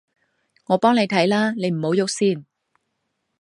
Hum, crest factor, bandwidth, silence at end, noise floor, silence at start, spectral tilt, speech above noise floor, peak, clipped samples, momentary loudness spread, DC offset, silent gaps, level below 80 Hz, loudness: none; 20 dB; 11.5 kHz; 1 s; -75 dBFS; 0.7 s; -5 dB/octave; 56 dB; -2 dBFS; under 0.1%; 6 LU; under 0.1%; none; -70 dBFS; -20 LUFS